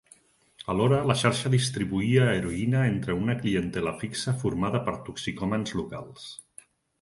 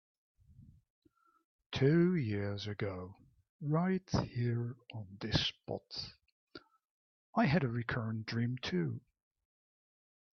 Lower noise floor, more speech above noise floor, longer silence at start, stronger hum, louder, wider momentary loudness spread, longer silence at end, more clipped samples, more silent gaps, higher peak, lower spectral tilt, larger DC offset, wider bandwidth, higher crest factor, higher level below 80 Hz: about the same, -59 dBFS vs -61 dBFS; first, 33 dB vs 26 dB; about the same, 0.6 s vs 0.6 s; neither; first, -27 LUFS vs -35 LUFS; about the same, 15 LU vs 14 LU; second, 0.65 s vs 1.4 s; neither; second, none vs 0.90-1.02 s, 1.45-1.59 s, 1.66-1.70 s, 3.49-3.59 s, 6.32-6.47 s, 6.90-7.33 s; first, -6 dBFS vs -16 dBFS; about the same, -6 dB/octave vs -5.5 dB/octave; neither; first, 11.5 kHz vs 6.6 kHz; about the same, 20 dB vs 22 dB; first, -52 dBFS vs -62 dBFS